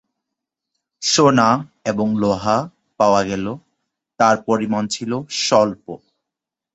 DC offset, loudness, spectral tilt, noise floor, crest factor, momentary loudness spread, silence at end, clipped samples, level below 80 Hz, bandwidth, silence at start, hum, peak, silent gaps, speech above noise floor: under 0.1%; -18 LUFS; -4.5 dB/octave; -85 dBFS; 18 dB; 15 LU; 0.8 s; under 0.1%; -54 dBFS; 8.2 kHz; 1 s; none; -2 dBFS; none; 68 dB